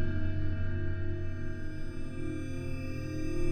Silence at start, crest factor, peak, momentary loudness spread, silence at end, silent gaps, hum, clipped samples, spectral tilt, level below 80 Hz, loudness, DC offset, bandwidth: 0 s; 12 dB; -18 dBFS; 6 LU; 0 s; none; none; under 0.1%; -7.5 dB/octave; -36 dBFS; -37 LUFS; under 0.1%; 9.2 kHz